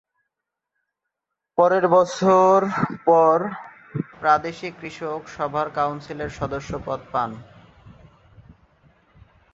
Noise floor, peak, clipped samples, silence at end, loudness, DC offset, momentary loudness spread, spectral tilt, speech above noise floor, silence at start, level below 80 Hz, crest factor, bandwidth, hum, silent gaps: -83 dBFS; -4 dBFS; under 0.1%; 2.1 s; -21 LUFS; under 0.1%; 16 LU; -6.5 dB/octave; 62 dB; 1.55 s; -54 dBFS; 20 dB; 8 kHz; none; none